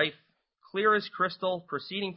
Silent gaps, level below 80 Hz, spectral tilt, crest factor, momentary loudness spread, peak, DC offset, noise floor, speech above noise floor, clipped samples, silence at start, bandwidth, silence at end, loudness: none; -74 dBFS; -8.5 dB/octave; 20 dB; 9 LU; -12 dBFS; under 0.1%; -67 dBFS; 37 dB; under 0.1%; 0 s; 5.8 kHz; 0 s; -29 LUFS